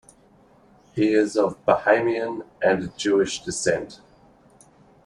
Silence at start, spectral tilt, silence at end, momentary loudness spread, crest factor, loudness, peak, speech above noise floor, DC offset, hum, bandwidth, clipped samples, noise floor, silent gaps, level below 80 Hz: 0.95 s; -4.5 dB/octave; 1.1 s; 9 LU; 20 dB; -22 LUFS; -4 dBFS; 33 dB; under 0.1%; none; 11 kHz; under 0.1%; -55 dBFS; none; -58 dBFS